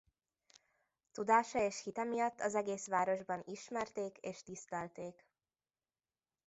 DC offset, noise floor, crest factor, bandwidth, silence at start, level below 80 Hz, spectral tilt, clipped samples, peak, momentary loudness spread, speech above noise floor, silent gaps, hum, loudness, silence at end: under 0.1%; under -90 dBFS; 22 dB; 8 kHz; 1.15 s; -78 dBFS; -4 dB/octave; under 0.1%; -16 dBFS; 15 LU; over 52 dB; none; none; -38 LUFS; 1.35 s